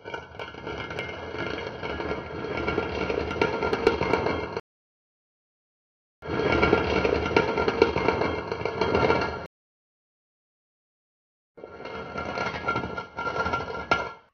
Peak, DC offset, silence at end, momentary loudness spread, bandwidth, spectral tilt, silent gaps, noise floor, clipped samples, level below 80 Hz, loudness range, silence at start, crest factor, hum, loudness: -2 dBFS; under 0.1%; 0.15 s; 14 LU; 7 kHz; -4 dB/octave; 4.60-6.22 s, 9.46-11.55 s; under -90 dBFS; under 0.1%; -46 dBFS; 10 LU; 0.05 s; 26 dB; none; -27 LUFS